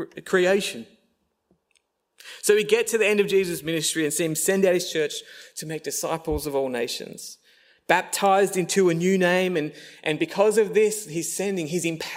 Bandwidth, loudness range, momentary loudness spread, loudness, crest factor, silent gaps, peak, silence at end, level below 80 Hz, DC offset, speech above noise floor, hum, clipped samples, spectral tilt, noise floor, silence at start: 16 kHz; 4 LU; 12 LU; -23 LUFS; 22 dB; none; -2 dBFS; 0 s; -54 dBFS; under 0.1%; 47 dB; none; under 0.1%; -3.5 dB/octave; -70 dBFS; 0 s